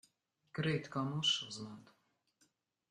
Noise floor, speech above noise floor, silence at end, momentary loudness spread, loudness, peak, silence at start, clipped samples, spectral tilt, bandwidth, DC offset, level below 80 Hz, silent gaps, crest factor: -78 dBFS; 40 dB; 1.1 s; 17 LU; -37 LUFS; -22 dBFS; 0.55 s; under 0.1%; -4 dB/octave; 10.5 kHz; under 0.1%; -76 dBFS; none; 20 dB